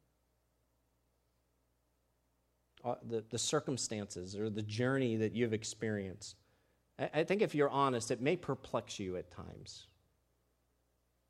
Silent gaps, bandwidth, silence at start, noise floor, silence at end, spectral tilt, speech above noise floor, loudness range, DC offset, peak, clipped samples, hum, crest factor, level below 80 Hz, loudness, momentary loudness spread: none; 14 kHz; 2.85 s; -78 dBFS; 1.45 s; -4.5 dB/octave; 42 dB; 6 LU; under 0.1%; -18 dBFS; under 0.1%; 60 Hz at -65 dBFS; 22 dB; -72 dBFS; -37 LUFS; 17 LU